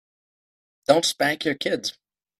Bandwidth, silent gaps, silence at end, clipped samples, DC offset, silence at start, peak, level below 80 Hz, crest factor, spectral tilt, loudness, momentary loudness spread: 15.5 kHz; none; 0.5 s; under 0.1%; under 0.1%; 0.9 s; -2 dBFS; -66 dBFS; 24 dB; -3 dB/octave; -23 LUFS; 11 LU